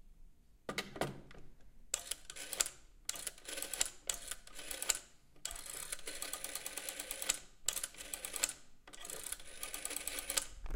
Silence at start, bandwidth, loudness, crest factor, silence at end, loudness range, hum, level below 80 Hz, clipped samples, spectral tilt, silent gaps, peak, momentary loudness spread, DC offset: 0.05 s; 17 kHz; -40 LUFS; 32 dB; 0 s; 2 LU; none; -58 dBFS; under 0.1%; -0.5 dB/octave; none; -12 dBFS; 10 LU; under 0.1%